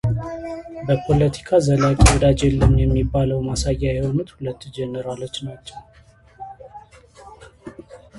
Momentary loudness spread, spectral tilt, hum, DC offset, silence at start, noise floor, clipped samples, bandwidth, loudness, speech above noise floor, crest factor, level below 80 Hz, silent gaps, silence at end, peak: 24 LU; -6 dB/octave; none; under 0.1%; 0.05 s; -45 dBFS; under 0.1%; 11.5 kHz; -20 LUFS; 26 dB; 20 dB; -28 dBFS; none; 0 s; 0 dBFS